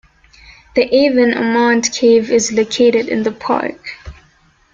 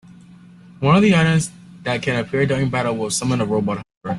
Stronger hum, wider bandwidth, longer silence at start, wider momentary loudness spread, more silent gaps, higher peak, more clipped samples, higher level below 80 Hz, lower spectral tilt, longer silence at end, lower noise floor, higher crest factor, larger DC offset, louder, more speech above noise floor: neither; second, 7.8 kHz vs 12.5 kHz; about the same, 0.75 s vs 0.8 s; about the same, 10 LU vs 11 LU; second, none vs 3.97-4.01 s; about the same, -2 dBFS vs -2 dBFS; neither; about the same, -46 dBFS vs -50 dBFS; second, -3.5 dB/octave vs -5.5 dB/octave; first, 0.6 s vs 0 s; first, -53 dBFS vs -44 dBFS; about the same, 14 dB vs 18 dB; neither; first, -14 LUFS vs -19 LUFS; first, 39 dB vs 26 dB